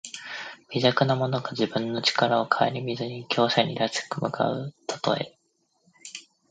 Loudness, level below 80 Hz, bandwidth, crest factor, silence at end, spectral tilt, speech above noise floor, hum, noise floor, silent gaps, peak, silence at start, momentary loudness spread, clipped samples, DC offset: -26 LUFS; -70 dBFS; 9.4 kHz; 22 dB; 0.3 s; -5 dB/octave; 44 dB; none; -69 dBFS; none; -4 dBFS; 0.05 s; 15 LU; under 0.1%; under 0.1%